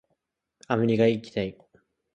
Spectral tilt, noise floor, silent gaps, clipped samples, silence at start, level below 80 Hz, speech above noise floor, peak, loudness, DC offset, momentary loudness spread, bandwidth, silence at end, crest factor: -7.5 dB/octave; -77 dBFS; none; under 0.1%; 0.7 s; -60 dBFS; 53 dB; -6 dBFS; -26 LUFS; under 0.1%; 10 LU; 8.8 kHz; 0.65 s; 22 dB